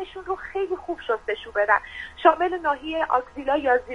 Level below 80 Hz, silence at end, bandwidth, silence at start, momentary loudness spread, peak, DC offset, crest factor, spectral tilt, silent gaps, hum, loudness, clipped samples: -52 dBFS; 0 s; 10 kHz; 0 s; 10 LU; -2 dBFS; under 0.1%; 22 dB; -5 dB/octave; none; none; -24 LUFS; under 0.1%